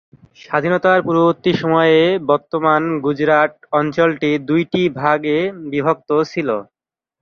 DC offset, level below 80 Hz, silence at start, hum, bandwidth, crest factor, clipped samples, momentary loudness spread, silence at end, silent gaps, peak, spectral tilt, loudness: under 0.1%; -58 dBFS; 0.5 s; none; 6.8 kHz; 16 dB; under 0.1%; 6 LU; 0.6 s; none; -2 dBFS; -7 dB/octave; -16 LUFS